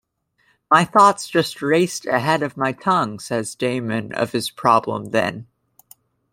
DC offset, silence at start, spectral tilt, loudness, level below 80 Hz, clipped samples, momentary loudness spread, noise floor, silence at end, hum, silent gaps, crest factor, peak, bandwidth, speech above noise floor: under 0.1%; 0.7 s; -4.5 dB/octave; -19 LUFS; -62 dBFS; under 0.1%; 10 LU; -64 dBFS; 0.9 s; none; none; 18 dB; -2 dBFS; 16.5 kHz; 45 dB